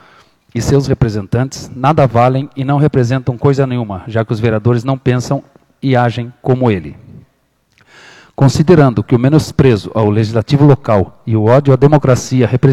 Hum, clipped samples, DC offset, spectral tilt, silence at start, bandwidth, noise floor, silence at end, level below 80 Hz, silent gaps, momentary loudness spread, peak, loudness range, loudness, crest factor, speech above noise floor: none; 0.6%; under 0.1%; -7.5 dB/octave; 0.55 s; 12 kHz; -58 dBFS; 0 s; -38 dBFS; none; 10 LU; 0 dBFS; 5 LU; -12 LUFS; 12 dB; 47 dB